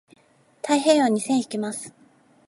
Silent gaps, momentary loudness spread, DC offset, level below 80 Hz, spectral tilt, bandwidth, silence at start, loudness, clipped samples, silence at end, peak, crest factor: none; 17 LU; under 0.1%; -78 dBFS; -4 dB/octave; 11.5 kHz; 0.65 s; -22 LUFS; under 0.1%; 0.55 s; -6 dBFS; 18 dB